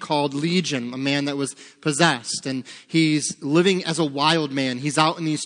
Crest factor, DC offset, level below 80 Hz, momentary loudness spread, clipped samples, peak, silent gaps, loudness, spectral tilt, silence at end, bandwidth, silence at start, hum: 22 dB; under 0.1%; -72 dBFS; 8 LU; under 0.1%; 0 dBFS; none; -22 LUFS; -4 dB/octave; 0 s; 10.5 kHz; 0 s; none